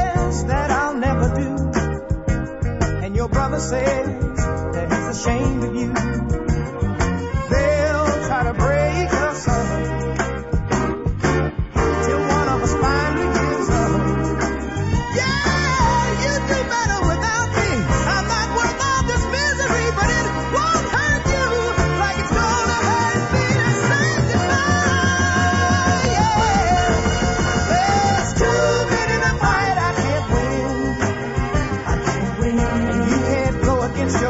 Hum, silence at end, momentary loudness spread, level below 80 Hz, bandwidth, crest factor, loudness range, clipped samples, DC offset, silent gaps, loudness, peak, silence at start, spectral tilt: none; 0 s; 6 LU; -28 dBFS; 8 kHz; 16 dB; 4 LU; under 0.1%; under 0.1%; none; -19 LUFS; -4 dBFS; 0 s; -5 dB/octave